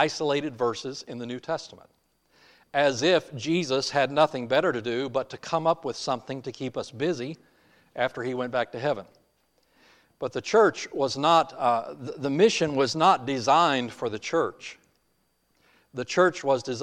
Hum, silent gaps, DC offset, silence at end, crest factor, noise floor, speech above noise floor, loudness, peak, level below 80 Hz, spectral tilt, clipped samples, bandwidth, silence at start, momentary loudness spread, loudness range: none; none; under 0.1%; 0 s; 20 dB; -71 dBFS; 46 dB; -26 LUFS; -8 dBFS; -68 dBFS; -4.5 dB/octave; under 0.1%; 11.5 kHz; 0 s; 14 LU; 8 LU